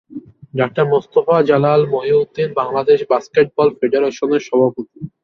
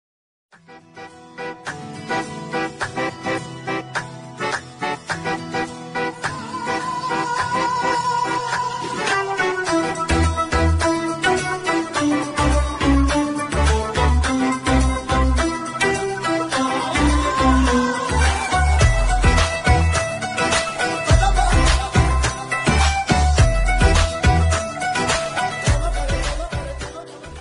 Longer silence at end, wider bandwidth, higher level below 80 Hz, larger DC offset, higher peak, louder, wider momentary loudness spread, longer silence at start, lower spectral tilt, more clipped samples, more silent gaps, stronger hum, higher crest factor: first, 0.15 s vs 0 s; second, 6.4 kHz vs 11.5 kHz; second, -58 dBFS vs -24 dBFS; neither; about the same, -2 dBFS vs -2 dBFS; first, -16 LUFS vs -20 LUFS; about the same, 9 LU vs 10 LU; second, 0.1 s vs 0.7 s; first, -7 dB/octave vs -4.5 dB/octave; neither; neither; neither; about the same, 14 dB vs 16 dB